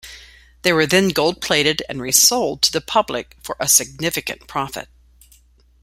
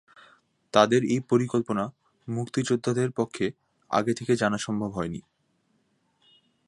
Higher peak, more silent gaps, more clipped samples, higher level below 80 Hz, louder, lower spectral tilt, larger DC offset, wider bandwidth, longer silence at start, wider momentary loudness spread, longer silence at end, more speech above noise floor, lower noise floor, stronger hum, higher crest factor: about the same, 0 dBFS vs -2 dBFS; neither; neither; first, -50 dBFS vs -62 dBFS; first, -17 LUFS vs -26 LUFS; second, -2 dB/octave vs -5.5 dB/octave; neither; first, 16.5 kHz vs 11.5 kHz; second, 0.05 s vs 0.75 s; about the same, 14 LU vs 12 LU; second, 1 s vs 1.5 s; second, 34 dB vs 45 dB; second, -53 dBFS vs -70 dBFS; neither; about the same, 20 dB vs 24 dB